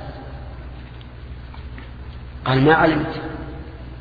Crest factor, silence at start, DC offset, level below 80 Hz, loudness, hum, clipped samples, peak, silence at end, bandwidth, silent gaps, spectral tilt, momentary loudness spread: 20 dB; 0 s; under 0.1%; -36 dBFS; -18 LUFS; 60 Hz at -45 dBFS; under 0.1%; -2 dBFS; 0 s; 5 kHz; none; -9 dB/octave; 22 LU